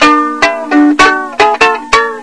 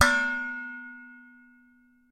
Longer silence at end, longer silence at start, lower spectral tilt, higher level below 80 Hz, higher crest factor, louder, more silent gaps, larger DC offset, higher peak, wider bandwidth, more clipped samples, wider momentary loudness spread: second, 0 s vs 0.9 s; about the same, 0 s vs 0 s; about the same, -2.5 dB/octave vs -2.5 dB/octave; first, -40 dBFS vs -58 dBFS; second, 8 dB vs 26 dB; first, -9 LUFS vs -28 LUFS; neither; neither; first, 0 dBFS vs -4 dBFS; second, 11 kHz vs 16 kHz; first, 2% vs under 0.1%; second, 4 LU vs 25 LU